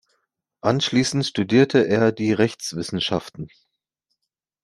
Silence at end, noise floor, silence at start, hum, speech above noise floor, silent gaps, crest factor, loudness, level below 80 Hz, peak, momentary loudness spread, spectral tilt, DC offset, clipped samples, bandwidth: 1.15 s; -81 dBFS; 0.65 s; none; 61 dB; none; 20 dB; -21 LUFS; -60 dBFS; -2 dBFS; 11 LU; -5 dB/octave; under 0.1%; under 0.1%; 12.5 kHz